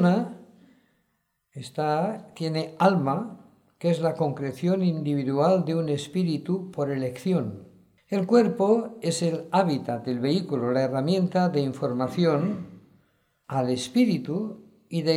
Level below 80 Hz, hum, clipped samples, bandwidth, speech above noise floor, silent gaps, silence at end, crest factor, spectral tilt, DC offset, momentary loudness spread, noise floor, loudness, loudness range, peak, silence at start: -72 dBFS; none; under 0.1%; 12.5 kHz; 50 dB; none; 0 s; 18 dB; -7 dB/octave; under 0.1%; 10 LU; -75 dBFS; -26 LUFS; 3 LU; -6 dBFS; 0 s